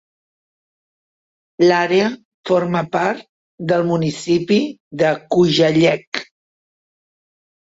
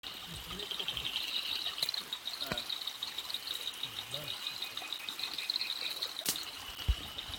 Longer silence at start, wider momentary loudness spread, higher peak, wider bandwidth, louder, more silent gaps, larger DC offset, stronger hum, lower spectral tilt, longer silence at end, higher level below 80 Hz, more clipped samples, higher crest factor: first, 1.6 s vs 0.05 s; first, 13 LU vs 5 LU; first, -2 dBFS vs -12 dBFS; second, 8 kHz vs 18 kHz; first, -17 LUFS vs -36 LUFS; first, 2.25-2.43 s, 3.29-3.58 s, 4.80-4.91 s, 6.07-6.12 s vs none; neither; neither; first, -6 dB/octave vs -1.5 dB/octave; first, 1.55 s vs 0 s; second, -58 dBFS vs -48 dBFS; neither; second, 16 dB vs 26 dB